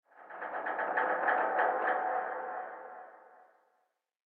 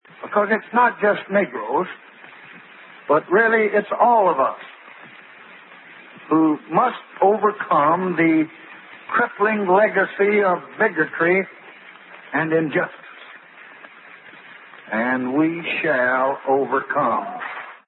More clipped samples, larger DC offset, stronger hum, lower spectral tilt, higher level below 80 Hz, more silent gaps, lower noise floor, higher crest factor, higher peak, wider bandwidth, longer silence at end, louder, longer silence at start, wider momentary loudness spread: neither; neither; neither; second, -0.5 dB/octave vs -11 dB/octave; second, under -90 dBFS vs -78 dBFS; neither; first, -78 dBFS vs -44 dBFS; about the same, 20 dB vs 18 dB; second, -16 dBFS vs -4 dBFS; about the same, 4.4 kHz vs 4.2 kHz; first, 0.95 s vs 0.1 s; second, -33 LUFS vs -19 LUFS; about the same, 0.15 s vs 0.2 s; first, 19 LU vs 16 LU